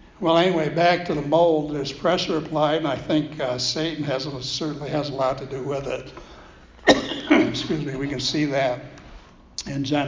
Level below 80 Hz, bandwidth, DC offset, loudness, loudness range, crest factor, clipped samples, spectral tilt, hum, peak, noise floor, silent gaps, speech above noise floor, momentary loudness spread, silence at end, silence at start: -50 dBFS; 7.6 kHz; under 0.1%; -23 LUFS; 5 LU; 22 dB; under 0.1%; -5 dB/octave; none; -2 dBFS; -46 dBFS; none; 24 dB; 11 LU; 0 s; 0.2 s